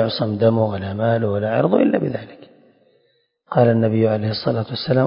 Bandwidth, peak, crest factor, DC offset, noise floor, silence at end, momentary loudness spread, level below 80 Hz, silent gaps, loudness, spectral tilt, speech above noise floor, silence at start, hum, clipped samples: 5.4 kHz; -2 dBFS; 18 dB; under 0.1%; -64 dBFS; 0 s; 6 LU; -50 dBFS; none; -19 LUFS; -12 dB/octave; 46 dB; 0 s; none; under 0.1%